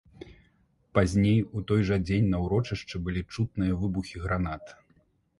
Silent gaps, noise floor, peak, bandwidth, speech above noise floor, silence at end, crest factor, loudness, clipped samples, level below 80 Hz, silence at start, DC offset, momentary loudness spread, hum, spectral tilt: none; -66 dBFS; -8 dBFS; 11.5 kHz; 39 dB; 0.65 s; 20 dB; -28 LUFS; under 0.1%; -42 dBFS; 0.2 s; under 0.1%; 9 LU; none; -7.5 dB/octave